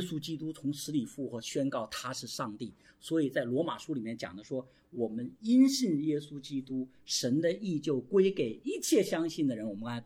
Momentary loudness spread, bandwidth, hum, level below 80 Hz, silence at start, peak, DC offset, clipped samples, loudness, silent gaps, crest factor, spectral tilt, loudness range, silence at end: 12 LU; 16 kHz; none; -72 dBFS; 0 s; -14 dBFS; under 0.1%; under 0.1%; -32 LUFS; none; 18 dB; -5 dB/octave; 5 LU; 0 s